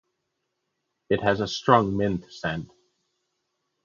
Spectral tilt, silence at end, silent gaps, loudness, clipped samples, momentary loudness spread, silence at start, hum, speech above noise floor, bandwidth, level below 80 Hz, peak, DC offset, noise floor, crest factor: -6 dB/octave; 1.2 s; none; -24 LUFS; under 0.1%; 11 LU; 1.1 s; none; 55 dB; 7.4 kHz; -54 dBFS; -2 dBFS; under 0.1%; -79 dBFS; 26 dB